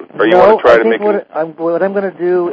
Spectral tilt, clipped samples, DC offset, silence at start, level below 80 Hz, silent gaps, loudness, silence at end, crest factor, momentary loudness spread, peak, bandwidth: -7 dB/octave; 1%; under 0.1%; 0 s; -48 dBFS; none; -11 LUFS; 0 s; 12 dB; 10 LU; 0 dBFS; 8 kHz